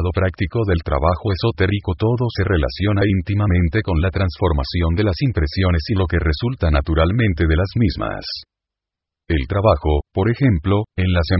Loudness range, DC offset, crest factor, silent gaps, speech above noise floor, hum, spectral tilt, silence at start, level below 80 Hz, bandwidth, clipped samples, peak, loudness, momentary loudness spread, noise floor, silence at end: 2 LU; under 0.1%; 16 dB; none; 68 dB; none; -11.5 dB/octave; 0 s; -24 dBFS; 5.8 kHz; under 0.1%; -2 dBFS; -19 LUFS; 4 LU; -85 dBFS; 0 s